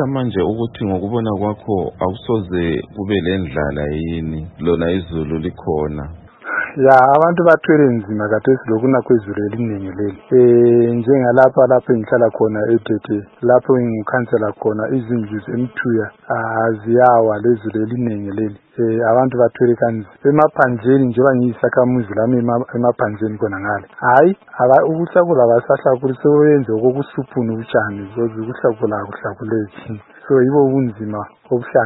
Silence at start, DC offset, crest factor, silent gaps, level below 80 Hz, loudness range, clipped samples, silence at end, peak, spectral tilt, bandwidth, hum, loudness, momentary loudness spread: 0 s; under 0.1%; 16 dB; none; -44 dBFS; 6 LU; under 0.1%; 0 s; 0 dBFS; -10 dB/octave; 4.1 kHz; none; -16 LUFS; 11 LU